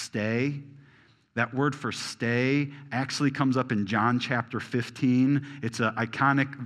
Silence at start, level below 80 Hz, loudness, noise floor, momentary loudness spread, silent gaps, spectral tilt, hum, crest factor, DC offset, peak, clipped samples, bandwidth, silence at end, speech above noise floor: 0 s; -72 dBFS; -27 LUFS; -59 dBFS; 8 LU; none; -6 dB/octave; none; 20 dB; under 0.1%; -8 dBFS; under 0.1%; 12 kHz; 0 s; 32 dB